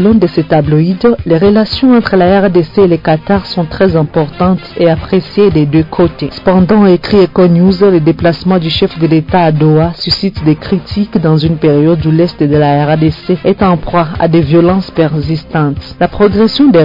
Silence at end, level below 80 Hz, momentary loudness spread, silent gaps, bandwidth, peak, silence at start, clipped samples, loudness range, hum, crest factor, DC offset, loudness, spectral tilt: 0 s; -32 dBFS; 6 LU; none; 5.4 kHz; 0 dBFS; 0 s; under 0.1%; 2 LU; none; 8 dB; under 0.1%; -9 LUFS; -9 dB/octave